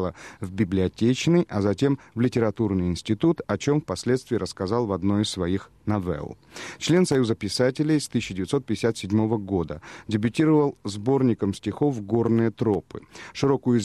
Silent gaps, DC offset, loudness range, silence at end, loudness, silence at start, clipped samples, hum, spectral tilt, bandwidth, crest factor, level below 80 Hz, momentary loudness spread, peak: none; under 0.1%; 2 LU; 0 s; -24 LUFS; 0 s; under 0.1%; none; -6.5 dB/octave; 13 kHz; 18 dB; -52 dBFS; 8 LU; -6 dBFS